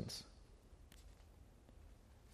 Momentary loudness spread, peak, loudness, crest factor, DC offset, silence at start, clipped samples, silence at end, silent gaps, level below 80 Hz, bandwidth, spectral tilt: 15 LU; -32 dBFS; -59 LUFS; 26 dB; under 0.1%; 0 s; under 0.1%; 0 s; none; -64 dBFS; 15 kHz; -4 dB/octave